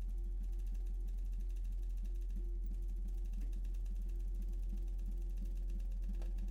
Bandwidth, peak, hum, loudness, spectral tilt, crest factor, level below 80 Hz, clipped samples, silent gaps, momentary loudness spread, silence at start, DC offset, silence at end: 2.9 kHz; -34 dBFS; none; -45 LUFS; -7.5 dB/octave; 6 dB; -40 dBFS; under 0.1%; none; 0 LU; 0 s; under 0.1%; 0 s